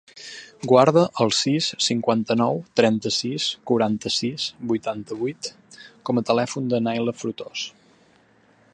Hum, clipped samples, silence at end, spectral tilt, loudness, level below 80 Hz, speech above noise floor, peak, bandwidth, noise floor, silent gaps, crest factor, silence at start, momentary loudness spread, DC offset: none; under 0.1%; 1.05 s; -4.5 dB/octave; -22 LUFS; -64 dBFS; 35 dB; -2 dBFS; 10 kHz; -58 dBFS; none; 22 dB; 0.15 s; 14 LU; under 0.1%